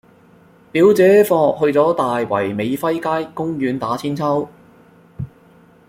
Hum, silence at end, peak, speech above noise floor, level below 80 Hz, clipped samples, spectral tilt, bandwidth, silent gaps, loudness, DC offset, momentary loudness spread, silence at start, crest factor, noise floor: none; 0.65 s; -2 dBFS; 33 dB; -56 dBFS; under 0.1%; -6.5 dB/octave; 16.5 kHz; none; -17 LUFS; under 0.1%; 18 LU; 0.75 s; 16 dB; -49 dBFS